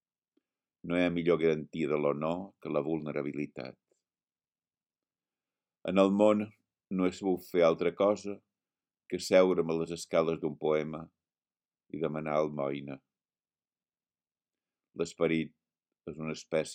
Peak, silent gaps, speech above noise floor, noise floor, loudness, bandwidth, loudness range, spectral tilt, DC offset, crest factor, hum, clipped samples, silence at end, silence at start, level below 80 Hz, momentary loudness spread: -10 dBFS; none; over 60 dB; under -90 dBFS; -31 LUFS; 15.5 kHz; 9 LU; -6 dB/octave; under 0.1%; 22 dB; none; under 0.1%; 0 s; 0.85 s; -70 dBFS; 17 LU